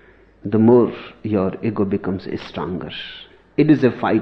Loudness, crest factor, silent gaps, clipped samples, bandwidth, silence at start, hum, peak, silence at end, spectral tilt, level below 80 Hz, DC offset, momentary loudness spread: -19 LUFS; 16 dB; none; under 0.1%; 6.2 kHz; 0.45 s; none; -2 dBFS; 0 s; -9.5 dB/octave; -52 dBFS; under 0.1%; 17 LU